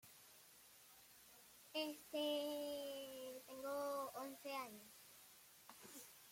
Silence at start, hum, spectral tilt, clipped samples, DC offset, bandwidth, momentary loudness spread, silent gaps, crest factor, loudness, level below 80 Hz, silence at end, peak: 0.05 s; none; -2 dB/octave; under 0.1%; under 0.1%; 16.5 kHz; 19 LU; none; 18 dB; -48 LUFS; -88 dBFS; 0 s; -32 dBFS